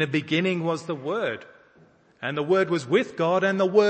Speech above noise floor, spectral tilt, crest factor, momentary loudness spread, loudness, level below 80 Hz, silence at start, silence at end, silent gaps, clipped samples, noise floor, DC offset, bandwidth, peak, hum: 34 dB; -6 dB/octave; 18 dB; 8 LU; -25 LUFS; -72 dBFS; 0 s; 0 s; none; under 0.1%; -57 dBFS; under 0.1%; 8.8 kHz; -6 dBFS; none